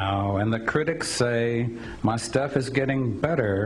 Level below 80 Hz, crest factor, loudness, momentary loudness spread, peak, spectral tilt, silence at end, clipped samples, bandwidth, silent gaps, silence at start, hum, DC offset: -50 dBFS; 16 dB; -25 LUFS; 3 LU; -8 dBFS; -5.5 dB/octave; 0 s; under 0.1%; 12.5 kHz; none; 0 s; none; under 0.1%